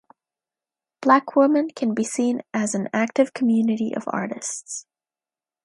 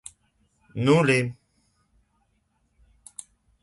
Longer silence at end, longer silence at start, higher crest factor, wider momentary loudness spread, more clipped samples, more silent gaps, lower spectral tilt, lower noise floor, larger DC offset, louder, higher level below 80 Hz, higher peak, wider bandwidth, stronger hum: second, 0.85 s vs 2.3 s; first, 1 s vs 0.75 s; about the same, 22 dB vs 22 dB; second, 11 LU vs 24 LU; neither; neither; about the same, -5 dB/octave vs -6 dB/octave; first, under -90 dBFS vs -70 dBFS; neither; about the same, -22 LUFS vs -22 LUFS; second, -74 dBFS vs -62 dBFS; first, -2 dBFS vs -6 dBFS; about the same, 11.5 kHz vs 11.5 kHz; neither